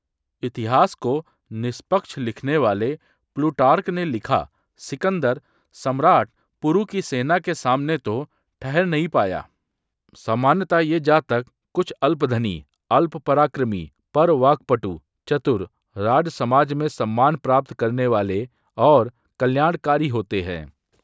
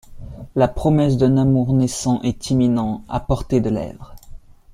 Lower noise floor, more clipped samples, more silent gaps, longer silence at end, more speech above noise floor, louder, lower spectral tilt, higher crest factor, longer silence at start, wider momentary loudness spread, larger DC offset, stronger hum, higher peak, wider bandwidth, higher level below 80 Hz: first, -79 dBFS vs -38 dBFS; neither; neither; first, 0.35 s vs 0.2 s; first, 59 dB vs 20 dB; about the same, -21 LUFS vs -19 LUFS; about the same, -7 dB/octave vs -7 dB/octave; first, 20 dB vs 14 dB; first, 0.45 s vs 0.1 s; first, 13 LU vs 10 LU; neither; neither; about the same, -2 dBFS vs -4 dBFS; second, 8 kHz vs 13 kHz; second, -52 dBFS vs -36 dBFS